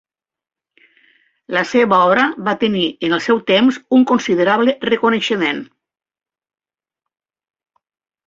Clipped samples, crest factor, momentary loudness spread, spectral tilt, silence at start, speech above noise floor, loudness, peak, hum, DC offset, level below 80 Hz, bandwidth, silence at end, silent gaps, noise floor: under 0.1%; 16 dB; 6 LU; -5 dB/octave; 1.5 s; 69 dB; -15 LUFS; -2 dBFS; none; under 0.1%; -60 dBFS; 7.6 kHz; 2.6 s; none; -84 dBFS